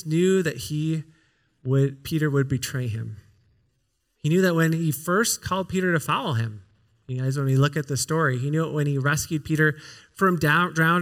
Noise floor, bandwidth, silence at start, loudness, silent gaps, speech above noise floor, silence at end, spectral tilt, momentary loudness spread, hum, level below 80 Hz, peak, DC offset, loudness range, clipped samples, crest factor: -72 dBFS; 17 kHz; 0.05 s; -24 LUFS; none; 49 dB; 0 s; -5.5 dB/octave; 10 LU; none; -58 dBFS; -6 dBFS; under 0.1%; 4 LU; under 0.1%; 18 dB